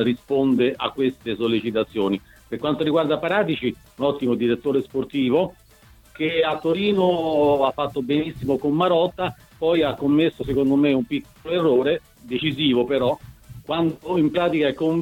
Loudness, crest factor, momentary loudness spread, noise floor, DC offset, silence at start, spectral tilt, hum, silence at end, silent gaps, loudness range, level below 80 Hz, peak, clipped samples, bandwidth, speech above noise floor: -22 LUFS; 16 dB; 8 LU; -51 dBFS; under 0.1%; 0 s; -7.5 dB/octave; none; 0 s; none; 2 LU; -52 dBFS; -6 dBFS; under 0.1%; 16.5 kHz; 30 dB